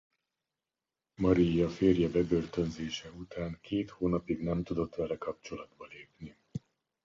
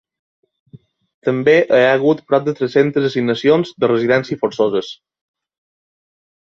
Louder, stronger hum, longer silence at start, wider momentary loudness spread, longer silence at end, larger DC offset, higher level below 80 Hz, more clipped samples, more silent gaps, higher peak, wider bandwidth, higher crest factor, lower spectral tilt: second, -32 LUFS vs -16 LUFS; neither; first, 1.2 s vs 0.75 s; first, 20 LU vs 9 LU; second, 0.45 s vs 1.5 s; neither; first, -52 dBFS vs -62 dBFS; neither; second, none vs 1.14-1.22 s; second, -14 dBFS vs -2 dBFS; about the same, 7.6 kHz vs 7.2 kHz; about the same, 20 dB vs 16 dB; about the same, -7.5 dB/octave vs -6.5 dB/octave